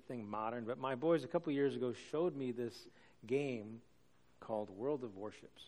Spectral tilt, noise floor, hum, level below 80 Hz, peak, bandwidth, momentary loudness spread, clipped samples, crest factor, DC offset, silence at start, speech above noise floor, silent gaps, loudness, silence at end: -7 dB/octave; -72 dBFS; none; -80 dBFS; -22 dBFS; 12.5 kHz; 15 LU; under 0.1%; 18 dB; under 0.1%; 0.1 s; 32 dB; none; -40 LUFS; 0 s